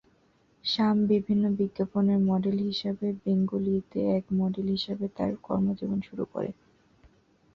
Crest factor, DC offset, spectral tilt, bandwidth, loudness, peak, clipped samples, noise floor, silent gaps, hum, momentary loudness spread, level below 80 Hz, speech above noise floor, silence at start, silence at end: 14 dB; under 0.1%; -8.5 dB/octave; 6.2 kHz; -28 LUFS; -14 dBFS; under 0.1%; -65 dBFS; none; none; 8 LU; -60 dBFS; 38 dB; 0.65 s; 1.05 s